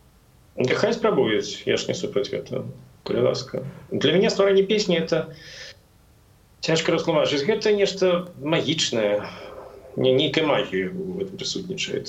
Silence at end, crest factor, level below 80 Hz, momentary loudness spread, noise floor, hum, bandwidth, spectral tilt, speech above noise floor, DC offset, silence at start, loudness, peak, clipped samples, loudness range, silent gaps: 0 s; 18 dB; -58 dBFS; 16 LU; -55 dBFS; none; 8.4 kHz; -4.5 dB/octave; 32 dB; under 0.1%; 0.55 s; -23 LUFS; -6 dBFS; under 0.1%; 2 LU; none